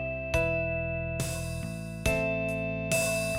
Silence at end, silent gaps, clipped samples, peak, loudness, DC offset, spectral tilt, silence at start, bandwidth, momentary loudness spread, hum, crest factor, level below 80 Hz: 0 s; none; under 0.1%; -12 dBFS; -30 LUFS; under 0.1%; -4.5 dB/octave; 0 s; 16.5 kHz; 7 LU; none; 18 dB; -42 dBFS